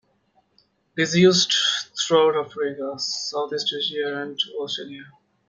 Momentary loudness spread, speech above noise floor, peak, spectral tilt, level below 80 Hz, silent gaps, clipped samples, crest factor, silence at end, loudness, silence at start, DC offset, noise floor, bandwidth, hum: 13 LU; 43 dB; -4 dBFS; -3.5 dB/octave; -66 dBFS; none; under 0.1%; 20 dB; 0.4 s; -22 LUFS; 0.95 s; under 0.1%; -65 dBFS; 9.4 kHz; none